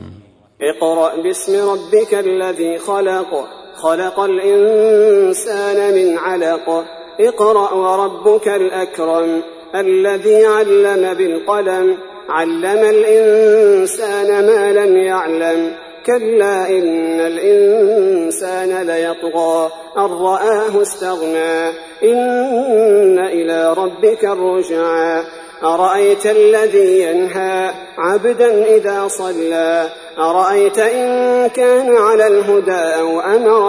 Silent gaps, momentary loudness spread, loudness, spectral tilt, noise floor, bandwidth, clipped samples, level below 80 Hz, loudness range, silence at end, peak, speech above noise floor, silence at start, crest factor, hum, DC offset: none; 9 LU; -13 LUFS; -4 dB/octave; -41 dBFS; 11 kHz; under 0.1%; -62 dBFS; 4 LU; 0 s; -2 dBFS; 29 dB; 0 s; 12 dB; none; under 0.1%